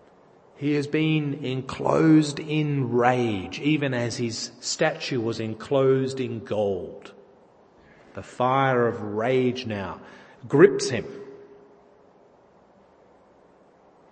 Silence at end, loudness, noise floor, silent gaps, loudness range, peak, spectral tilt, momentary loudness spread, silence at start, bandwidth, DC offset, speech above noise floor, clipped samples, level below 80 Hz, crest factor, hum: 2.65 s; -24 LUFS; -56 dBFS; none; 4 LU; -2 dBFS; -6 dB/octave; 18 LU; 0.6 s; 8.8 kHz; under 0.1%; 32 dB; under 0.1%; -64 dBFS; 24 dB; none